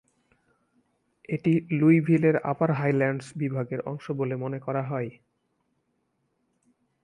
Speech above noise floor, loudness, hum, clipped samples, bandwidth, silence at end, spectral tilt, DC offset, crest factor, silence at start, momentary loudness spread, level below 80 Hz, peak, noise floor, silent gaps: 49 dB; -26 LUFS; none; under 0.1%; 10.5 kHz; 1.95 s; -9 dB/octave; under 0.1%; 18 dB; 1.3 s; 12 LU; -68 dBFS; -8 dBFS; -74 dBFS; none